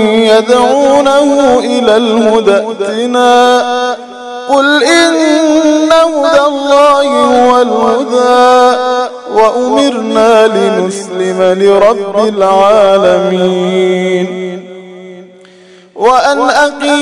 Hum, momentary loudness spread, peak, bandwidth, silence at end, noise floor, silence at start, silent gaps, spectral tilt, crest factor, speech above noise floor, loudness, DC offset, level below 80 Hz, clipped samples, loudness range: none; 8 LU; 0 dBFS; 12 kHz; 0 s; -38 dBFS; 0 s; none; -4 dB/octave; 8 dB; 30 dB; -8 LUFS; under 0.1%; -48 dBFS; 3%; 4 LU